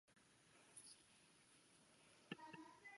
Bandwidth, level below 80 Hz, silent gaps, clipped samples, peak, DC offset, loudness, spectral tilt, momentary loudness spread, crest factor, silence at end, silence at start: 11.5 kHz; under -90 dBFS; none; under 0.1%; -34 dBFS; under 0.1%; -60 LUFS; -3 dB/octave; 8 LU; 30 dB; 0 s; 0.05 s